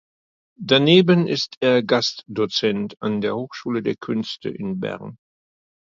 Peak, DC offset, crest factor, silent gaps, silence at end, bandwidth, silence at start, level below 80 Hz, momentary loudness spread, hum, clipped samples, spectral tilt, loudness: 0 dBFS; under 0.1%; 20 dB; 1.57-1.61 s; 0.8 s; 7.6 kHz; 0.6 s; -62 dBFS; 14 LU; none; under 0.1%; -5.5 dB/octave; -20 LUFS